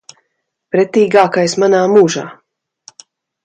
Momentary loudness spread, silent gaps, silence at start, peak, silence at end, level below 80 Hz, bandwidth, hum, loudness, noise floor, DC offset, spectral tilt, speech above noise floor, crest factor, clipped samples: 10 LU; none; 0.75 s; 0 dBFS; 1.1 s; -62 dBFS; 9.2 kHz; none; -12 LUFS; -71 dBFS; under 0.1%; -5 dB/octave; 59 dB; 14 dB; under 0.1%